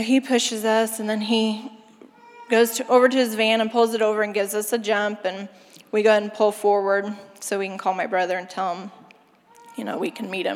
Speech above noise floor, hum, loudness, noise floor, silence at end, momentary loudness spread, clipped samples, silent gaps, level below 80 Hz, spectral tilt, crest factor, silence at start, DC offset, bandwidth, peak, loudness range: 32 dB; none; -22 LUFS; -54 dBFS; 0 s; 14 LU; under 0.1%; none; -84 dBFS; -3.5 dB/octave; 18 dB; 0 s; under 0.1%; 16.5 kHz; -4 dBFS; 6 LU